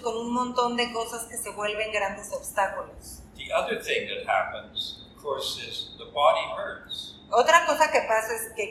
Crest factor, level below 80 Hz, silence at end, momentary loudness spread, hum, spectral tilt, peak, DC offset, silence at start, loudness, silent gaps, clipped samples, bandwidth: 22 dB; -56 dBFS; 0 s; 13 LU; none; -2 dB/octave; -4 dBFS; under 0.1%; 0 s; -26 LUFS; none; under 0.1%; 15.5 kHz